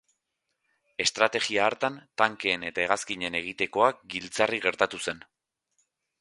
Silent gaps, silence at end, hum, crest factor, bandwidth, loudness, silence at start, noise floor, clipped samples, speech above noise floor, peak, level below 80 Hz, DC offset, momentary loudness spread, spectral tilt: none; 1 s; none; 26 dB; 11.5 kHz; -27 LUFS; 1 s; -81 dBFS; under 0.1%; 53 dB; -2 dBFS; -66 dBFS; under 0.1%; 10 LU; -2 dB/octave